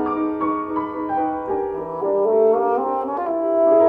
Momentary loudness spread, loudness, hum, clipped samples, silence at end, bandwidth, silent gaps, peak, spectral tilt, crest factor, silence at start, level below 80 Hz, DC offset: 8 LU; -21 LUFS; none; under 0.1%; 0 s; 3.8 kHz; none; -6 dBFS; -9.5 dB/octave; 14 dB; 0 s; -56 dBFS; under 0.1%